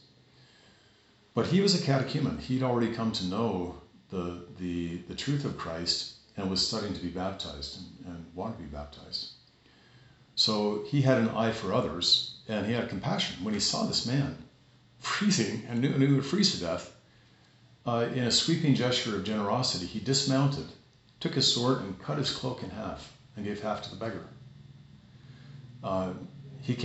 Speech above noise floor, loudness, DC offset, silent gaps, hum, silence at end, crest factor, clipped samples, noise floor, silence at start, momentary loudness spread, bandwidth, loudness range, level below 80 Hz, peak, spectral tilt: 32 dB; -29 LUFS; under 0.1%; none; none; 0 s; 22 dB; under 0.1%; -62 dBFS; 1.35 s; 15 LU; 8.2 kHz; 9 LU; -58 dBFS; -10 dBFS; -4.5 dB/octave